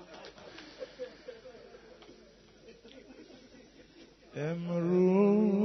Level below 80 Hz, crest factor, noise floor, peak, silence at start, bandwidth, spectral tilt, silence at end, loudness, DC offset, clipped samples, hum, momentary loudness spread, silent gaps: -70 dBFS; 18 dB; -58 dBFS; -16 dBFS; 0 s; 6.2 kHz; -8 dB/octave; 0 s; -29 LUFS; under 0.1%; under 0.1%; none; 28 LU; none